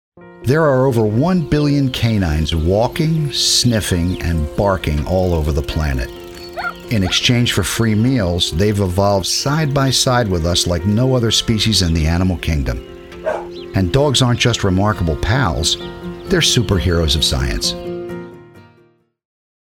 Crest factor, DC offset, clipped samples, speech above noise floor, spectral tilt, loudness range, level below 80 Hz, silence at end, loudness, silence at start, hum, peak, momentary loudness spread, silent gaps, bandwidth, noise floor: 16 dB; under 0.1%; under 0.1%; 39 dB; -4.5 dB/octave; 3 LU; -28 dBFS; 1 s; -16 LUFS; 0.2 s; none; 0 dBFS; 12 LU; none; 18 kHz; -54 dBFS